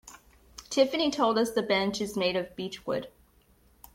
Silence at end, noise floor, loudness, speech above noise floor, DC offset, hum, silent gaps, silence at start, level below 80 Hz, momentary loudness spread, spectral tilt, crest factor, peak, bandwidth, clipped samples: 0.85 s; -62 dBFS; -28 LUFS; 35 dB; under 0.1%; none; none; 0.05 s; -62 dBFS; 14 LU; -4 dB/octave; 20 dB; -10 dBFS; 16.5 kHz; under 0.1%